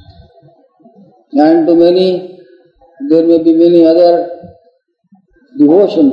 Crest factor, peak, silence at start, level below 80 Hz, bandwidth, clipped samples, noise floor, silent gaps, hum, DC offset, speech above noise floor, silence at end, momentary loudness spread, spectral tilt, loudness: 10 dB; 0 dBFS; 1.35 s; -54 dBFS; 5.4 kHz; 0.4%; -54 dBFS; none; none; under 0.1%; 46 dB; 0 s; 16 LU; -8.5 dB/octave; -9 LUFS